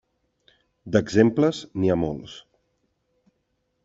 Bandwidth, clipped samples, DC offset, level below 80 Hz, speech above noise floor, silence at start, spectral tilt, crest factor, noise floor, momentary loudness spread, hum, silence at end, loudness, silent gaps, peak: 8 kHz; under 0.1%; under 0.1%; -56 dBFS; 52 dB; 0.85 s; -7 dB/octave; 22 dB; -74 dBFS; 19 LU; none; 1.45 s; -22 LUFS; none; -4 dBFS